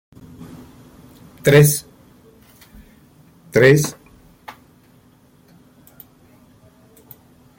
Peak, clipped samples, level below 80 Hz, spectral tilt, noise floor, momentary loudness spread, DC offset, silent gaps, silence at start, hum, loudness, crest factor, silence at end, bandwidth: -2 dBFS; under 0.1%; -52 dBFS; -5.5 dB/octave; -52 dBFS; 29 LU; under 0.1%; none; 0.4 s; none; -15 LUFS; 20 dB; 3.1 s; 17 kHz